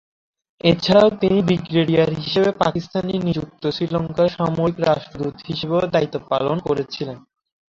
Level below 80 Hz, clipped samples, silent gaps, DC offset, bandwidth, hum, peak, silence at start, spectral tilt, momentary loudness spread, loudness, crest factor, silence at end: -50 dBFS; under 0.1%; none; under 0.1%; 7.6 kHz; none; -2 dBFS; 0.65 s; -7 dB/octave; 11 LU; -20 LUFS; 18 dB; 0.55 s